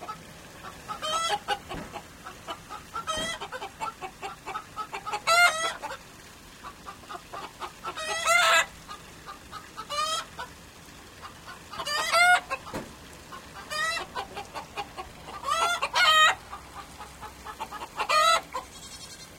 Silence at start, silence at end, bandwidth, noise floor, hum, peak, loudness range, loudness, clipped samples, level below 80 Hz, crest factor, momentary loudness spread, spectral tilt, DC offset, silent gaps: 0 s; 0 s; 16 kHz; -48 dBFS; none; -8 dBFS; 9 LU; -26 LUFS; under 0.1%; -56 dBFS; 22 dB; 24 LU; -0.5 dB/octave; under 0.1%; none